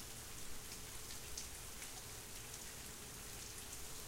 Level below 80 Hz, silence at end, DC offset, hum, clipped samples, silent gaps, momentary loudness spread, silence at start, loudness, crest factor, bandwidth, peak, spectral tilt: -60 dBFS; 0 s; under 0.1%; none; under 0.1%; none; 2 LU; 0 s; -49 LUFS; 22 dB; 16 kHz; -28 dBFS; -1.5 dB/octave